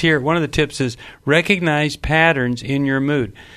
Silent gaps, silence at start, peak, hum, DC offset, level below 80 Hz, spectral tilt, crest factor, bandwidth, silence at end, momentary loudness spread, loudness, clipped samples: none; 0 s; 0 dBFS; none; under 0.1%; -38 dBFS; -5.5 dB/octave; 18 dB; 13.5 kHz; 0 s; 7 LU; -18 LUFS; under 0.1%